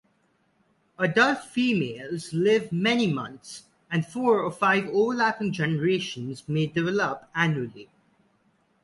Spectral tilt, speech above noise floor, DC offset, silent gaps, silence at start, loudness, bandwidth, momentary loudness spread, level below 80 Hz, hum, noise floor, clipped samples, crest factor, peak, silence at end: -6 dB/octave; 43 dB; under 0.1%; none; 1 s; -25 LUFS; 11.5 kHz; 11 LU; -66 dBFS; none; -68 dBFS; under 0.1%; 20 dB; -6 dBFS; 1 s